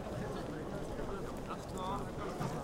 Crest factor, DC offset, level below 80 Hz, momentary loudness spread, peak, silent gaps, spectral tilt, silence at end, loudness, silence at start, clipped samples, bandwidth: 16 dB; under 0.1%; -50 dBFS; 3 LU; -26 dBFS; none; -6 dB/octave; 0 s; -41 LUFS; 0 s; under 0.1%; 16.5 kHz